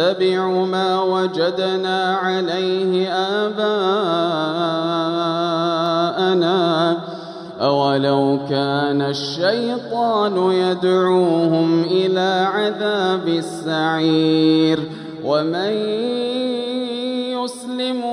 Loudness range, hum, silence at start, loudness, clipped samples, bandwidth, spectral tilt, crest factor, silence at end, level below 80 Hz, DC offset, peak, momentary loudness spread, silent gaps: 2 LU; none; 0 s; -19 LUFS; under 0.1%; 11.5 kHz; -6 dB/octave; 14 dB; 0 s; -68 dBFS; under 0.1%; -4 dBFS; 6 LU; none